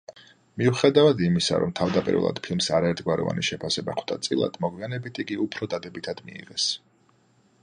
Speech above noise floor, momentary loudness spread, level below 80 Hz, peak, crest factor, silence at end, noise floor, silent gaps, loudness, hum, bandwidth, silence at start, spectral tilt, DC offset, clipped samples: 38 dB; 14 LU; -56 dBFS; -4 dBFS; 20 dB; 0.85 s; -62 dBFS; none; -25 LUFS; none; 10.5 kHz; 0.1 s; -5 dB/octave; under 0.1%; under 0.1%